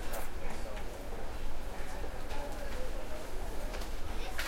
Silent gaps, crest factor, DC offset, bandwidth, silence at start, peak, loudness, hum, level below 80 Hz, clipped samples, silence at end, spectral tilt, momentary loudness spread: none; 12 dB; under 0.1%; 16 kHz; 0 s; -20 dBFS; -43 LUFS; none; -38 dBFS; under 0.1%; 0 s; -4 dB/octave; 2 LU